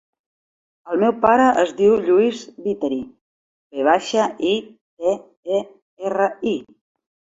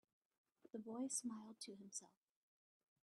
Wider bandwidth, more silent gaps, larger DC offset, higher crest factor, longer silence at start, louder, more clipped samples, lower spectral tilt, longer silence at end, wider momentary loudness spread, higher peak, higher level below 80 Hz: second, 8 kHz vs 12 kHz; first, 3.21-3.70 s, 4.81-4.97 s, 5.37-5.43 s, 5.82-5.97 s vs none; neither; about the same, 18 dB vs 22 dB; first, 0.85 s vs 0.65 s; first, -20 LUFS vs -50 LUFS; neither; first, -5 dB/octave vs -3 dB/octave; second, 0.65 s vs 0.95 s; about the same, 13 LU vs 11 LU; first, -2 dBFS vs -32 dBFS; first, -60 dBFS vs under -90 dBFS